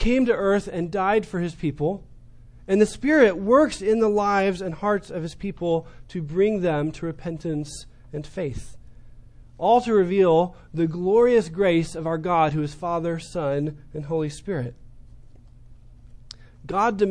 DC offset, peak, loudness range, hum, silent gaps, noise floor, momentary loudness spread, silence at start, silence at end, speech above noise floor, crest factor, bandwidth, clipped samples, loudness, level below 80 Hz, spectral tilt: under 0.1%; -4 dBFS; 9 LU; none; none; -46 dBFS; 13 LU; 0 s; 0 s; 24 dB; 20 dB; 10.5 kHz; under 0.1%; -23 LUFS; -42 dBFS; -6.5 dB/octave